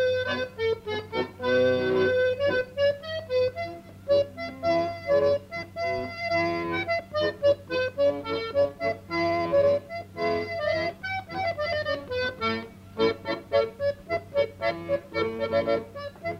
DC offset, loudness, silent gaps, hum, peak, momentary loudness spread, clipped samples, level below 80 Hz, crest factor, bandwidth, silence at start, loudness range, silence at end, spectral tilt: under 0.1%; -27 LUFS; none; none; -12 dBFS; 8 LU; under 0.1%; -58 dBFS; 16 dB; 15 kHz; 0 s; 3 LU; 0 s; -6 dB/octave